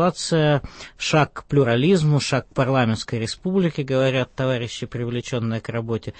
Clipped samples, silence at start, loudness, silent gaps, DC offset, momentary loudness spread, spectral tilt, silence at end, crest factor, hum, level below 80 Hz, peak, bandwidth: under 0.1%; 0 s; -22 LUFS; none; under 0.1%; 9 LU; -6 dB/octave; 0.1 s; 14 dB; none; -48 dBFS; -6 dBFS; 8.8 kHz